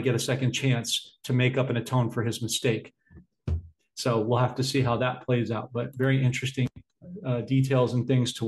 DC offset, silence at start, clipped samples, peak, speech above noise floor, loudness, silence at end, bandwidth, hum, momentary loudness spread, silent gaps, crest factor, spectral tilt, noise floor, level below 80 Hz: under 0.1%; 0 s; under 0.1%; -10 dBFS; 23 dB; -27 LUFS; 0 s; 12.5 kHz; none; 9 LU; none; 16 dB; -5.5 dB/octave; -49 dBFS; -50 dBFS